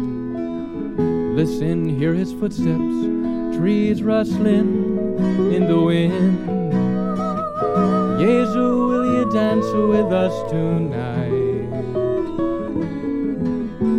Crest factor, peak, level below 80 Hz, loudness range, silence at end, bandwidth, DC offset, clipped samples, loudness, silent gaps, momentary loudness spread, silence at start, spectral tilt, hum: 14 dB; -6 dBFS; -44 dBFS; 3 LU; 0 s; 10.5 kHz; under 0.1%; under 0.1%; -20 LUFS; none; 7 LU; 0 s; -8.5 dB/octave; none